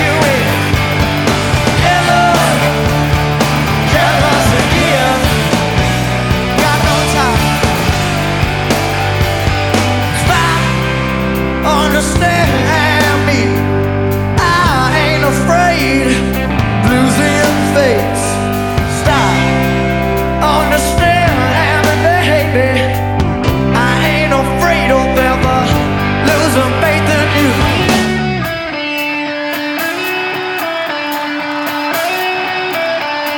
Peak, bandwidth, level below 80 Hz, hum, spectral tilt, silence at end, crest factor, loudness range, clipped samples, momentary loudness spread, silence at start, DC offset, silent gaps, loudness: 0 dBFS; over 20 kHz; -24 dBFS; none; -5 dB/octave; 0 s; 12 dB; 3 LU; under 0.1%; 5 LU; 0 s; under 0.1%; none; -12 LUFS